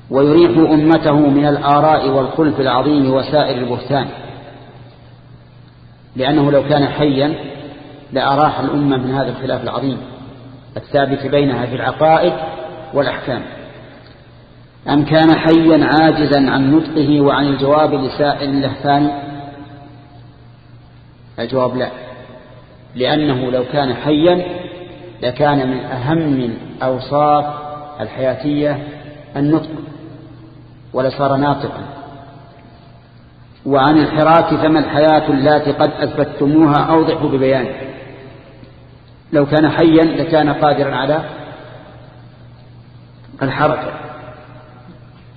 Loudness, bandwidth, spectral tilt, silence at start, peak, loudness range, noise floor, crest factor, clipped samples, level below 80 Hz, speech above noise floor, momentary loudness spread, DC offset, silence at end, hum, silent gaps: -14 LUFS; 5 kHz; -10 dB/octave; 0.05 s; 0 dBFS; 9 LU; -42 dBFS; 16 dB; under 0.1%; -44 dBFS; 28 dB; 21 LU; under 0.1%; 0.05 s; none; none